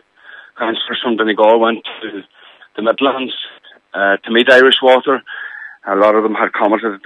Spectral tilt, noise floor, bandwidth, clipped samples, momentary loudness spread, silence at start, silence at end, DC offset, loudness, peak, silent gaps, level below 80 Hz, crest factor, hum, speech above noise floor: -4.5 dB/octave; -40 dBFS; 10.5 kHz; under 0.1%; 19 LU; 0.35 s; 0.1 s; under 0.1%; -13 LUFS; 0 dBFS; none; -66 dBFS; 14 dB; none; 27 dB